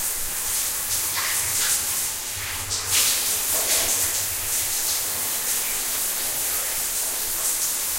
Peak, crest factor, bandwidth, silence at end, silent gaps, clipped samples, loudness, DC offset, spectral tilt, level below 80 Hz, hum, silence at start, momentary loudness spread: -8 dBFS; 16 dB; 16 kHz; 0 s; none; under 0.1%; -21 LUFS; under 0.1%; 1 dB/octave; -46 dBFS; none; 0 s; 5 LU